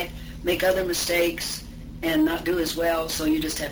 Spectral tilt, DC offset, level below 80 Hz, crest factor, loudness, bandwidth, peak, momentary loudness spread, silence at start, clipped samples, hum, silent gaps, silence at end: -3.5 dB/octave; under 0.1%; -42 dBFS; 14 dB; -24 LUFS; over 20 kHz; -10 dBFS; 9 LU; 0 s; under 0.1%; none; none; 0 s